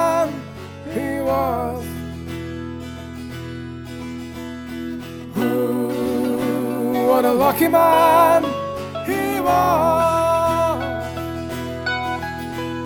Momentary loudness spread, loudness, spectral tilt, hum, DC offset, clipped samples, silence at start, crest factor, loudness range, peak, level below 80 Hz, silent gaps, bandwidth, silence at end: 16 LU; -20 LUFS; -5.5 dB/octave; none; under 0.1%; under 0.1%; 0 s; 18 dB; 13 LU; -2 dBFS; -48 dBFS; none; over 20 kHz; 0 s